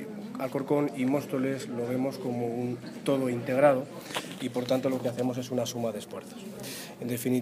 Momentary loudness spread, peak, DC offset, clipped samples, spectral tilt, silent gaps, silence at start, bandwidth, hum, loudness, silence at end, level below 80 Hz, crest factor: 13 LU; -10 dBFS; under 0.1%; under 0.1%; -5.5 dB/octave; none; 0 s; 15.5 kHz; none; -30 LUFS; 0 s; -72 dBFS; 20 dB